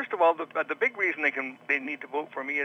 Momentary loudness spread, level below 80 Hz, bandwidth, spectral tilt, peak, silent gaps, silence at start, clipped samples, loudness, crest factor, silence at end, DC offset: 9 LU; under -90 dBFS; 10 kHz; -4.5 dB/octave; -10 dBFS; none; 0 s; under 0.1%; -28 LUFS; 18 dB; 0 s; under 0.1%